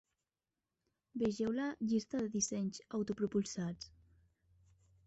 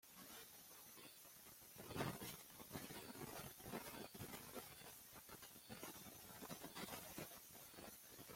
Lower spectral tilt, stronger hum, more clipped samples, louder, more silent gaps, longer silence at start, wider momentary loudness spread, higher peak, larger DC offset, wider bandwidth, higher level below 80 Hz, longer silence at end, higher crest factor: first, -6.5 dB/octave vs -3.5 dB/octave; neither; neither; first, -38 LUFS vs -55 LUFS; neither; first, 1.15 s vs 0.05 s; about the same, 8 LU vs 7 LU; first, -24 dBFS vs -30 dBFS; neither; second, 8 kHz vs 16.5 kHz; first, -70 dBFS vs -78 dBFS; first, 1.2 s vs 0 s; second, 16 dB vs 26 dB